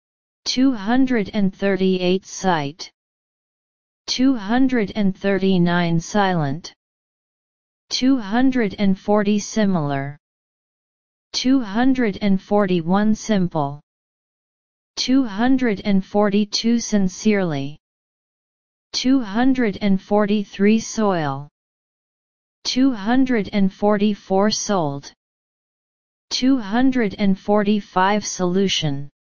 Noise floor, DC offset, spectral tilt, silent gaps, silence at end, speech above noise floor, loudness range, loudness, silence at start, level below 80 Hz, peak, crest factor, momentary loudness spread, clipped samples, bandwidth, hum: under -90 dBFS; 3%; -5.5 dB/octave; 2.94-4.05 s, 6.76-7.88 s, 10.20-11.31 s, 13.83-14.94 s, 17.80-18.90 s, 21.51-22.62 s, 25.17-26.28 s; 0.2 s; over 71 dB; 2 LU; -20 LUFS; 0.4 s; -48 dBFS; -2 dBFS; 16 dB; 8 LU; under 0.1%; 7.2 kHz; none